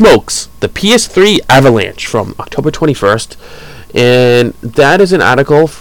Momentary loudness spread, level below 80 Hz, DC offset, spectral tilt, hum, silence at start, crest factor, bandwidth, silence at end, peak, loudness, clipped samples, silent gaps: 10 LU; -34 dBFS; 2%; -4.5 dB/octave; none; 0 s; 10 dB; 18.5 kHz; 0.05 s; 0 dBFS; -9 LUFS; under 0.1%; none